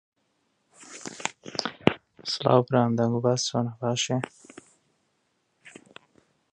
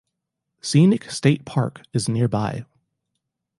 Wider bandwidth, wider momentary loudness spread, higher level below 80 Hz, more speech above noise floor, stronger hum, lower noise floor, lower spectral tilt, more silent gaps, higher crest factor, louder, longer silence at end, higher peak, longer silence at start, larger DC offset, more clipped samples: about the same, 10.5 kHz vs 11.5 kHz; first, 17 LU vs 11 LU; second, -64 dBFS vs -56 dBFS; second, 48 dB vs 60 dB; neither; second, -73 dBFS vs -80 dBFS; about the same, -5 dB/octave vs -6 dB/octave; neither; first, 28 dB vs 18 dB; second, -26 LUFS vs -21 LUFS; about the same, 0.85 s vs 0.95 s; first, 0 dBFS vs -4 dBFS; first, 0.8 s vs 0.65 s; neither; neither